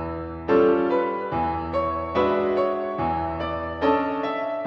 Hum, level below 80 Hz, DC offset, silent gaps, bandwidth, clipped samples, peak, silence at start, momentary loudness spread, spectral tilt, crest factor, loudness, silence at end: none; -44 dBFS; under 0.1%; none; 6.2 kHz; under 0.1%; -8 dBFS; 0 s; 7 LU; -8.5 dB/octave; 16 dB; -24 LUFS; 0 s